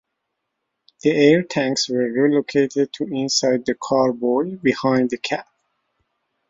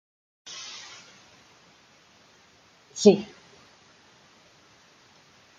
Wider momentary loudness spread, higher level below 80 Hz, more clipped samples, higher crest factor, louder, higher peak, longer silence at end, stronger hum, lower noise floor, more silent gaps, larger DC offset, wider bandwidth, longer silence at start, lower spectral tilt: second, 8 LU vs 28 LU; first, -62 dBFS vs -76 dBFS; neither; second, 18 dB vs 28 dB; first, -19 LUFS vs -24 LUFS; about the same, -2 dBFS vs -2 dBFS; second, 1.1 s vs 2.35 s; neither; first, -77 dBFS vs -58 dBFS; neither; neither; second, 7.8 kHz vs 9 kHz; first, 1.05 s vs 0.5 s; about the same, -4.5 dB/octave vs -5 dB/octave